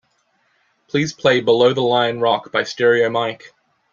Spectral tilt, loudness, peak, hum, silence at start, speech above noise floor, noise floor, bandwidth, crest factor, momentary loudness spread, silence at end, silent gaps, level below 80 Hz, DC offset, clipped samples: -5 dB/octave; -17 LUFS; -2 dBFS; none; 0.95 s; 47 dB; -64 dBFS; 7.4 kHz; 16 dB; 8 LU; 0.45 s; none; -64 dBFS; under 0.1%; under 0.1%